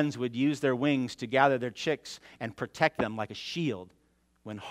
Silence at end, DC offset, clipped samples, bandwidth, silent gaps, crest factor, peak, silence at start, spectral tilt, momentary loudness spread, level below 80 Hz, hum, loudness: 0 s; under 0.1%; under 0.1%; 13.5 kHz; none; 22 dB; -8 dBFS; 0 s; -5.5 dB/octave; 16 LU; -68 dBFS; none; -30 LUFS